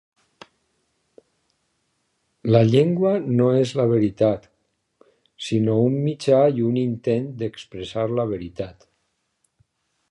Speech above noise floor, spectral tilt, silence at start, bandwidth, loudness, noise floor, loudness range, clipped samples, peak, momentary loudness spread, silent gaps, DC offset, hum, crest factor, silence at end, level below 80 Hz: 52 dB; -8 dB/octave; 2.45 s; 11 kHz; -21 LUFS; -72 dBFS; 4 LU; under 0.1%; -2 dBFS; 14 LU; none; under 0.1%; none; 20 dB; 1.4 s; -58 dBFS